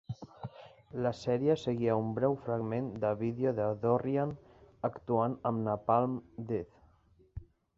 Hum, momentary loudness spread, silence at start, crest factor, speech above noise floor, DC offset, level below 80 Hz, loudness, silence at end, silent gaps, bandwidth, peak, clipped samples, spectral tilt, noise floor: none; 18 LU; 0.1 s; 20 dB; 33 dB; under 0.1%; -62 dBFS; -33 LUFS; 0.35 s; none; 7.6 kHz; -14 dBFS; under 0.1%; -8.5 dB/octave; -65 dBFS